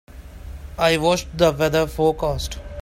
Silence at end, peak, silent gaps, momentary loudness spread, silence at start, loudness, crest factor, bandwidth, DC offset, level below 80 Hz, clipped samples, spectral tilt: 0 s; -2 dBFS; none; 20 LU; 0.1 s; -20 LUFS; 20 dB; 16.5 kHz; under 0.1%; -36 dBFS; under 0.1%; -5 dB/octave